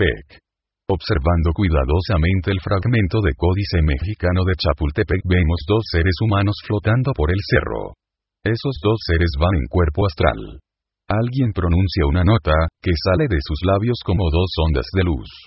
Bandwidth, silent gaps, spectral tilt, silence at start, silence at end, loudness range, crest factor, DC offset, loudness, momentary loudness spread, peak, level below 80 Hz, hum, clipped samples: 5.8 kHz; none; -11 dB/octave; 0 s; 0.05 s; 2 LU; 18 dB; under 0.1%; -19 LUFS; 4 LU; 0 dBFS; -24 dBFS; none; under 0.1%